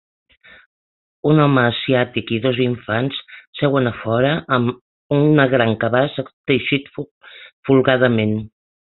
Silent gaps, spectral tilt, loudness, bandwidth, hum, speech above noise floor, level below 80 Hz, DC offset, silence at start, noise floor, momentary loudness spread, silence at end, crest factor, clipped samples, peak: 3.47-3.53 s, 4.81-5.09 s, 6.33-6.44 s, 7.11-7.21 s, 7.53-7.63 s; -11.5 dB/octave; -18 LUFS; 4.3 kHz; none; over 73 dB; -54 dBFS; under 0.1%; 1.25 s; under -90 dBFS; 15 LU; 0.45 s; 18 dB; under 0.1%; -2 dBFS